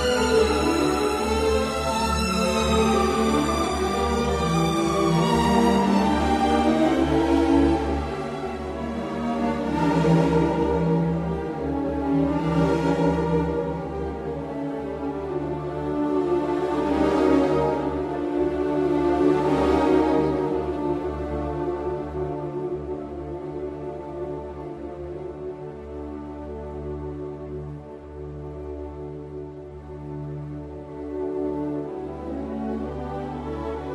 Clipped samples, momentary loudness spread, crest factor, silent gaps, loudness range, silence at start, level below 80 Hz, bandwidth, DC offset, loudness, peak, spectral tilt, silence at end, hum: under 0.1%; 15 LU; 18 dB; none; 14 LU; 0 s; -38 dBFS; 13 kHz; under 0.1%; -24 LUFS; -6 dBFS; -6 dB/octave; 0 s; none